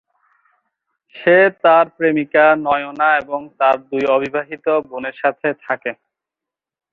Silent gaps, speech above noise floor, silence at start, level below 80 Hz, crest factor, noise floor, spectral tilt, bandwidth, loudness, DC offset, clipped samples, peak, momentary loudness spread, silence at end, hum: none; 70 dB; 1.15 s; -62 dBFS; 16 dB; -87 dBFS; -7 dB/octave; 6.2 kHz; -16 LUFS; under 0.1%; under 0.1%; -2 dBFS; 11 LU; 1 s; none